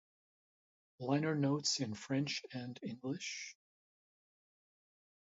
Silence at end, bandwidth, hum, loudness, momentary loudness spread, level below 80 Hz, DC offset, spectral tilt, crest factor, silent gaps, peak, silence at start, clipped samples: 1.7 s; 7.6 kHz; none; -38 LUFS; 12 LU; -80 dBFS; under 0.1%; -4.5 dB/octave; 20 dB; none; -20 dBFS; 1 s; under 0.1%